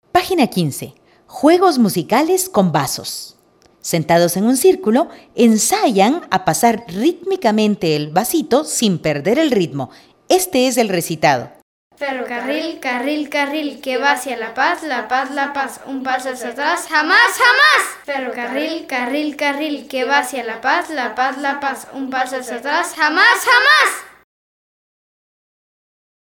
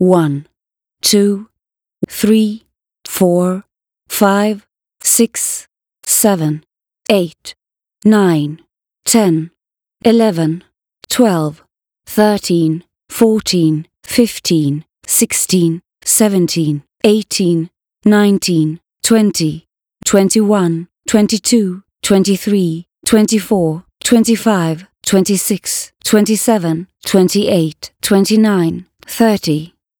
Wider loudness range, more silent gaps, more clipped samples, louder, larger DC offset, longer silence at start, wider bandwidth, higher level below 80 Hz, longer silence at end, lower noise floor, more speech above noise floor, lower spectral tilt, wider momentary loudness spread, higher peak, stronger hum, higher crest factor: first, 5 LU vs 2 LU; first, 11.62-11.90 s vs none; neither; about the same, -16 LUFS vs -14 LUFS; neither; first, 0.15 s vs 0 s; second, 18 kHz vs over 20 kHz; second, -58 dBFS vs -52 dBFS; first, 2.15 s vs 0.35 s; second, -53 dBFS vs -80 dBFS; second, 37 dB vs 67 dB; about the same, -3.5 dB/octave vs -4.5 dB/octave; about the same, 12 LU vs 11 LU; about the same, 0 dBFS vs 0 dBFS; neither; about the same, 16 dB vs 14 dB